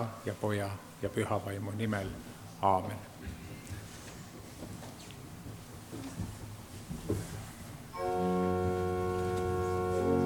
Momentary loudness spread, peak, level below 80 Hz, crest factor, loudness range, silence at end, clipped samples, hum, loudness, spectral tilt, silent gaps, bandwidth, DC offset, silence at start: 16 LU; -14 dBFS; -54 dBFS; 22 dB; 11 LU; 0 s; under 0.1%; none; -35 LUFS; -6.5 dB/octave; none; 19 kHz; under 0.1%; 0 s